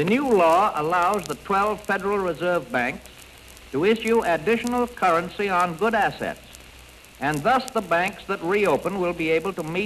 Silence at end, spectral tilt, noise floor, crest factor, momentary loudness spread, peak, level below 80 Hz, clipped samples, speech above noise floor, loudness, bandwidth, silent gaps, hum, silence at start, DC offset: 0 s; -5 dB/octave; -46 dBFS; 16 dB; 8 LU; -6 dBFS; -52 dBFS; under 0.1%; 24 dB; -23 LUFS; 13 kHz; none; none; 0 s; under 0.1%